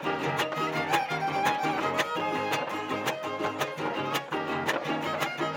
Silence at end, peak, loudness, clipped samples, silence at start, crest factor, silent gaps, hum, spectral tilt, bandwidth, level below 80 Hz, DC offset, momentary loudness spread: 0 s; -12 dBFS; -29 LUFS; under 0.1%; 0 s; 18 dB; none; none; -4 dB/octave; 17 kHz; -72 dBFS; under 0.1%; 4 LU